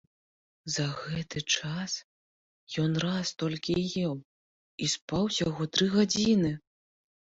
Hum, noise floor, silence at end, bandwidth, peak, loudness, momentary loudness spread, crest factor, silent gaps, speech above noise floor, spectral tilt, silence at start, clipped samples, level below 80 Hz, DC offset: none; under -90 dBFS; 0.8 s; 8 kHz; -12 dBFS; -29 LUFS; 11 LU; 20 dB; 2.04-2.67 s, 4.25-4.78 s, 5.02-5.08 s; over 61 dB; -4.5 dB/octave; 0.65 s; under 0.1%; -60 dBFS; under 0.1%